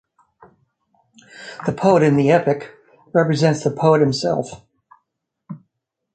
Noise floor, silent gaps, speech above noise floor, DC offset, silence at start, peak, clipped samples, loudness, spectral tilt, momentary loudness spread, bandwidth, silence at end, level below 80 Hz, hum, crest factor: -77 dBFS; none; 60 dB; under 0.1%; 1.35 s; -2 dBFS; under 0.1%; -17 LUFS; -6.5 dB/octave; 24 LU; 9.2 kHz; 0.55 s; -58 dBFS; none; 18 dB